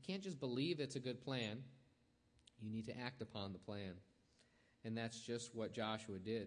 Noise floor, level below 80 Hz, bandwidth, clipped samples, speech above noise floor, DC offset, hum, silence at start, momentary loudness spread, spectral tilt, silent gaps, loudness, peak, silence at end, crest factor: -76 dBFS; -82 dBFS; 10 kHz; under 0.1%; 30 dB; under 0.1%; none; 0 s; 12 LU; -5 dB/octave; none; -47 LUFS; -28 dBFS; 0 s; 18 dB